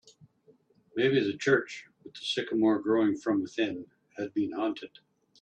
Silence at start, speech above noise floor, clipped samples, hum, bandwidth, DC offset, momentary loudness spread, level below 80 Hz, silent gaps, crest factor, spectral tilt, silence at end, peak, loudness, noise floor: 0.95 s; 35 dB; under 0.1%; none; 9.4 kHz; under 0.1%; 16 LU; -74 dBFS; none; 20 dB; -5.5 dB/octave; 0.55 s; -10 dBFS; -29 LUFS; -64 dBFS